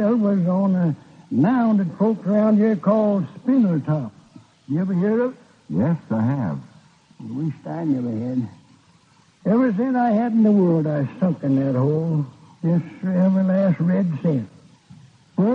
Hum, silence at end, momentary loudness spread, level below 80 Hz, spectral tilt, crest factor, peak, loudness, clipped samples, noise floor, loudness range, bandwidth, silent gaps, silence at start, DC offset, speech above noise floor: none; 0 s; 10 LU; -66 dBFS; -10.5 dB/octave; 14 dB; -6 dBFS; -21 LUFS; under 0.1%; -56 dBFS; 6 LU; 6 kHz; none; 0 s; under 0.1%; 36 dB